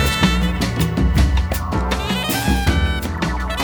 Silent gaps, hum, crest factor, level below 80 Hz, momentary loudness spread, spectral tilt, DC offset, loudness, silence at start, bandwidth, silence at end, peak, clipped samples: none; none; 14 dB; -22 dBFS; 5 LU; -5 dB/octave; under 0.1%; -19 LUFS; 0 s; over 20 kHz; 0 s; -4 dBFS; under 0.1%